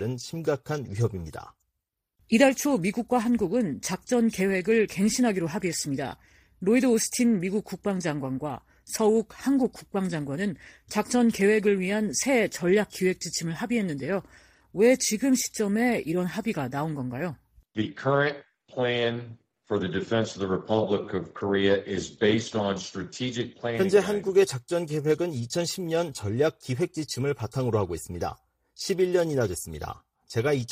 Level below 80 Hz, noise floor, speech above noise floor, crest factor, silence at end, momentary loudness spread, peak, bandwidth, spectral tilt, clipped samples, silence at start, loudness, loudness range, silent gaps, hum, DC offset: -58 dBFS; -83 dBFS; 57 dB; 20 dB; 0 s; 11 LU; -6 dBFS; 15.5 kHz; -5 dB/octave; under 0.1%; 0 s; -26 LUFS; 4 LU; none; none; under 0.1%